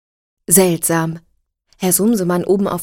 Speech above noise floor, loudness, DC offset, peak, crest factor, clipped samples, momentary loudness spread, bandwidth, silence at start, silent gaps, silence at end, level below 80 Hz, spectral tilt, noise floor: 44 dB; -15 LUFS; under 0.1%; 0 dBFS; 18 dB; under 0.1%; 13 LU; 17.5 kHz; 0.5 s; none; 0 s; -50 dBFS; -4.5 dB/octave; -59 dBFS